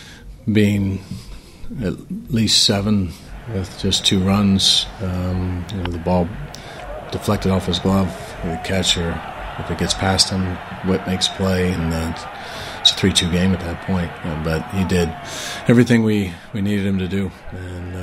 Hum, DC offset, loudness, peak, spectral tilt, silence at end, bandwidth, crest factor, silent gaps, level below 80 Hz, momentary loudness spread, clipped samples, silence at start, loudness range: none; under 0.1%; -19 LUFS; 0 dBFS; -4.5 dB/octave; 0 s; 16 kHz; 20 dB; none; -38 dBFS; 15 LU; under 0.1%; 0 s; 4 LU